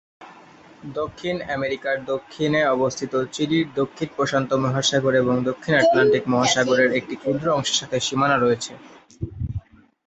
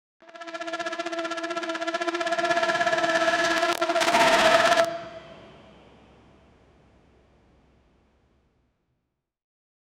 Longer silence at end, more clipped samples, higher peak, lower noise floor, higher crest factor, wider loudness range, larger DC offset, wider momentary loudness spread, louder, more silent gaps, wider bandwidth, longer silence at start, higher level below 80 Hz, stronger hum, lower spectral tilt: second, 0.5 s vs 4.5 s; neither; about the same, -4 dBFS vs -2 dBFS; second, -47 dBFS vs -80 dBFS; second, 18 dB vs 24 dB; about the same, 4 LU vs 6 LU; neither; second, 12 LU vs 17 LU; about the same, -21 LUFS vs -23 LUFS; neither; second, 8.4 kHz vs 17 kHz; second, 0.2 s vs 0.35 s; first, -48 dBFS vs -62 dBFS; neither; first, -4.5 dB/octave vs -2 dB/octave